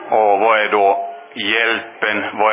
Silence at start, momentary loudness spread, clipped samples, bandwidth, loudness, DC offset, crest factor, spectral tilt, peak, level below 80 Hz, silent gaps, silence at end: 0 s; 8 LU; under 0.1%; 3.9 kHz; -16 LUFS; under 0.1%; 16 dB; -6.5 dB/octave; 0 dBFS; -66 dBFS; none; 0 s